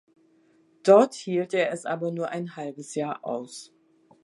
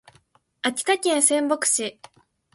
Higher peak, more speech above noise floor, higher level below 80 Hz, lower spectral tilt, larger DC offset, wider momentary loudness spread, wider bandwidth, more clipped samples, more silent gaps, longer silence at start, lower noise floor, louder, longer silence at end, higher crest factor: about the same, -4 dBFS vs -4 dBFS; about the same, 37 dB vs 38 dB; second, -82 dBFS vs -74 dBFS; first, -5.5 dB/octave vs -0.5 dB/octave; neither; first, 17 LU vs 9 LU; about the same, 11.5 kHz vs 12 kHz; neither; neither; first, 0.85 s vs 0.65 s; about the same, -62 dBFS vs -61 dBFS; second, -25 LUFS vs -21 LUFS; about the same, 0.6 s vs 0.65 s; about the same, 22 dB vs 22 dB